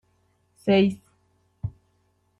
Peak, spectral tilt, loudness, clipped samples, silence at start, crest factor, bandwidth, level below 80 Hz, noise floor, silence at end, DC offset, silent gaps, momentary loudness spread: -8 dBFS; -7.5 dB/octave; -25 LUFS; under 0.1%; 0.65 s; 18 dB; 11.5 kHz; -56 dBFS; -68 dBFS; 0.7 s; under 0.1%; none; 17 LU